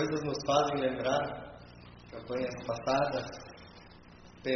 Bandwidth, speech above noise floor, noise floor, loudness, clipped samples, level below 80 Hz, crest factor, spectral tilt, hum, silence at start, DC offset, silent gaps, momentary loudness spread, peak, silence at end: 6.4 kHz; 22 dB; -54 dBFS; -32 LUFS; under 0.1%; -60 dBFS; 22 dB; -4 dB/octave; none; 0 s; under 0.1%; none; 23 LU; -12 dBFS; 0 s